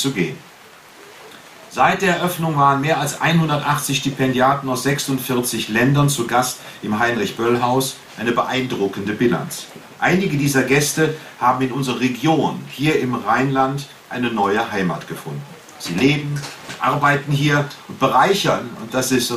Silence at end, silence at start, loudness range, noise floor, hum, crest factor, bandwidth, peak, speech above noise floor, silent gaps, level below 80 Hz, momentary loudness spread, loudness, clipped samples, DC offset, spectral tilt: 0 s; 0 s; 3 LU; -44 dBFS; none; 18 dB; 15.5 kHz; -2 dBFS; 25 dB; none; -54 dBFS; 12 LU; -19 LUFS; under 0.1%; under 0.1%; -4.5 dB/octave